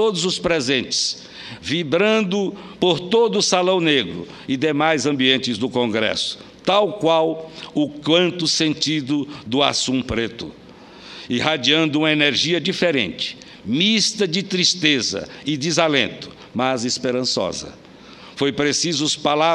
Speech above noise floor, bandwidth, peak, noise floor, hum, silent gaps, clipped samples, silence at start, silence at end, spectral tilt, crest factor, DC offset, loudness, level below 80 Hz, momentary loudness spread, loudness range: 22 dB; 11.5 kHz; 0 dBFS; -42 dBFS; none; none; under 0.1%; 0 s; 0 s; -3.5 dB/octave; 20 dB; under 0.1%; -19 LUFS; -54 dBFS; 11 LU; 3 LU